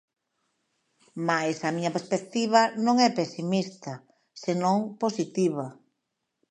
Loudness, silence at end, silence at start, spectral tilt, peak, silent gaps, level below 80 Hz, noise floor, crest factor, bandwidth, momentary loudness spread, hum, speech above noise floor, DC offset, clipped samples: -26 LUFS; 0.75 s; 1.15 s; -5 dB/octave; -6 dBFS; none; -80 dBFS; -81 dBFS; 22 dB; 10 kHz; 15 LU; none; 55 dB; under 0.1%; under 0.1%